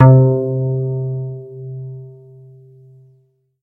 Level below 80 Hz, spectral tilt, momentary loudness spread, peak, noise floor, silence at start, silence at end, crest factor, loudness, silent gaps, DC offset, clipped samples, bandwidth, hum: -52 dBFS; -13 dB/octave; 21 LU; 0 dBFS; -57 dBFS; 0 s; 1.5 s; 16 dB; -17 LUFS; none; under 0.1%; under 0.1%; 2.2 kHz; none